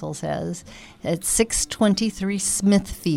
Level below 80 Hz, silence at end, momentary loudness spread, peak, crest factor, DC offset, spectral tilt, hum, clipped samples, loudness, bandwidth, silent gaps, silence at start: -42 dBFS; 0 s; 11 LU; -6 dBFS; 18 dB; under 0.1%; -4 dB/octave; none; under 0.1%; -22 LUFS; 16.5 kHz; none; 0 s